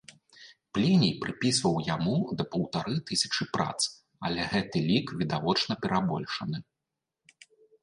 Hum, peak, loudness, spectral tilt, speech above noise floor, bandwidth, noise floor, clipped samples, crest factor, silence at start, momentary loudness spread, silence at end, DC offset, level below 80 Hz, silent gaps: none; -10 dBFS; -29 LUFS; -4.5 dB/octave; 59 dB; 11.5 kHz; -87 dBFS; under 0.1%; 18 dB; 0.1 s; 8 LU; 1.2 s; under 0.1%; -60 dBFS; none